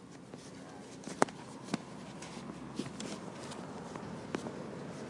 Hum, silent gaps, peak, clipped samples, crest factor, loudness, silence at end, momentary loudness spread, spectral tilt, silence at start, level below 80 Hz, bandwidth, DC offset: none; none; -6 dBFS; under 0.1%; 36 dB; -42 LUFS; 0 s; 14 LU; -4.5 dB/octave; 0 s; -70 dBFS; 11.5 kHz; under 0.1%